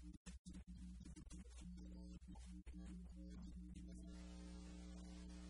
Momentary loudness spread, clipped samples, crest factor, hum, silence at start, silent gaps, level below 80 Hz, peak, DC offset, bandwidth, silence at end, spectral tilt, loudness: 2 LU; under 0.1%; 12 dB; none; 0 s; 0.17-0.25 s, 0.39-0.45 s; -58 dBFS; -44 dBFS; under 0.1%; 11 kHz; 0 s; -6 dB/octave; -58 LUFS